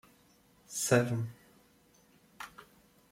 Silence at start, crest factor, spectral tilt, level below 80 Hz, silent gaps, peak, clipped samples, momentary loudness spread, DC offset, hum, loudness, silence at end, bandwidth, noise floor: 0.7 s; 24 dB; -4.5 dB/octave; -70 dBFS; none; -14 dBFS; under 0.1%; 20 LU; under 0.1%; none; -32 LUFS; 0.5 s; 16.5 kHz; -65 dBFS